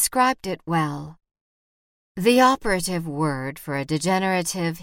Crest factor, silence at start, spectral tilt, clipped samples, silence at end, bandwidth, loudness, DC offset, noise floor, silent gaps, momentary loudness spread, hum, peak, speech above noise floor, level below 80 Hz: 20 dB; 0 s; -4.5 dB/octave; under 0.1%; 0 s; 17.5 kHz; -22 LUFS; under 0.1%; under -90 dBFS; 1.41-2.15 s; 12 LU; none; -4 dBFS; over 68 dB; -50 dBFS